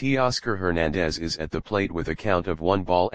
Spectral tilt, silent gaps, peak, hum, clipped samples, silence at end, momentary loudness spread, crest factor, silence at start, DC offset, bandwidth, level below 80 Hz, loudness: -5.5 dB/octave; none; -6 dBFS; none; under 0.1%; 0 s; 6 LU; 18 dB; 0 s; 1%; 9.8 kHz; -42 dBFS; -25 LUFS